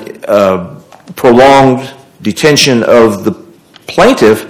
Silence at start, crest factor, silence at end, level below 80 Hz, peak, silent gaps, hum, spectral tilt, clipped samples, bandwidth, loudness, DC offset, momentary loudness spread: 0 s; 8 dB; 0 s; -40 dBFS; 0 dBFS; none; none; -4.5 dB/octave; 7%; over 20 kHz; -8 LUFS; under 0.1%; 17 LU